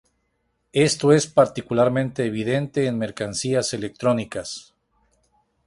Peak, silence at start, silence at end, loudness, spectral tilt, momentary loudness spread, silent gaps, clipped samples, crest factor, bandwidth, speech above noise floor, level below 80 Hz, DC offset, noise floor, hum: -4 dBFS; 0.75 s; 1.05 s; -22 LUFS; -5 dB/octave; 10 LU; none; under 0.1%; 20 dB; 11.5 kHz; 50 dB; -56 dBFS; under 0.1%; -71 dBFS; none